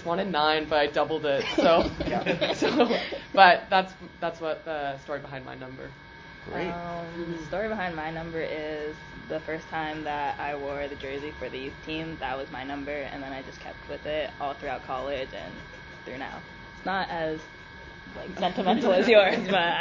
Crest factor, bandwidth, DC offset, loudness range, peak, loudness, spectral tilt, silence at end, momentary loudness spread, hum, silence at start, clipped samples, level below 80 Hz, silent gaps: 26 dB; 7.6 kHz; under 0.1%; 11 LU; -2 dBFS; -27 LUFS; -5.5 dB/octave; 0 s; 19 LU; none; 0 s; under 0.1%; -52 dBFS; none